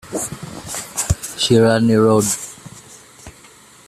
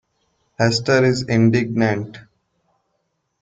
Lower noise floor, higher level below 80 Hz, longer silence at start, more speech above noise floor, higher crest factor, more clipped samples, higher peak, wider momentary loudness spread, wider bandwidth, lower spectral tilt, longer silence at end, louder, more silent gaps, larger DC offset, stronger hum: second, -45 dBFS vs -72 dBFS; first, -38 dBFS vs -54 dBFS; second, 0.05 s vs 0.6 s; second, 31 dB vs 54 dB; about the same, 16 dB vs 18 dB; neither; about the same, -2 dBFS vs -2 dBFS; first, 19 LU vs 7 LU; first, 15 kHz vs 9.2 kHz; second, -4.5 dB/octave vs -6 dB/octave; second, 0.55 s vs 1.2 s; about the same, -17 LUFS vs -18 LUFS; neither; neither; neither